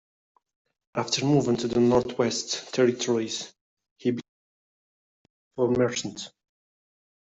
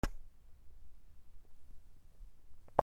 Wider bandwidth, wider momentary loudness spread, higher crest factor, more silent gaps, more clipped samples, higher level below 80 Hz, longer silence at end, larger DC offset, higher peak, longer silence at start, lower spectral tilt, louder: second, 8.2 kHz vs 15.5 kHz; second, 13 LU vs 19 LU; second, 20 dB vs 32 dB; first, 3.61-3.77 s, 3.91-3.96 s, 4.29-5.51 s vs none; neither; second, -62 dBFS vs -50 dBFS; first, 0.9 s vs 0 s; neither; about the same, -8 dBFS vs -10 dBFS; first, 0.95 s vs 0.05 s; second, -4.5 dB/octave vs -6.5 dB/octave; first, -26 LUFS vs -40 LUFS